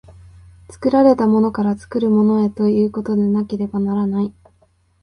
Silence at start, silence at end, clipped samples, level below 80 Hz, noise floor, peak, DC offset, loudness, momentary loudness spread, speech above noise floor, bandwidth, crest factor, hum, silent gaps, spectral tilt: 0.1 s; 0.75 s; under 0.1%; -50 dBFS; -58 dBFS; -2 dBFS; under 0.1%; -17 LUFS; 8 LU; 42 dB; 10 kHz; 16 dB; none; none; -9 dB/octave